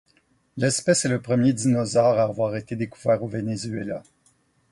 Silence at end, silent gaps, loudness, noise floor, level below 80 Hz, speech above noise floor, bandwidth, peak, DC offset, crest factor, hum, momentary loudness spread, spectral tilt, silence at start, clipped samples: 0.7 s; none; -23 LUFS; -64 dBFS; -60 dBFS; 41 dB; 11.5 kHz; -6 dBFS; under 0.1%; 18 dB; none; 11 LU; -5 dB/octave; 0.55 s; under 0.1%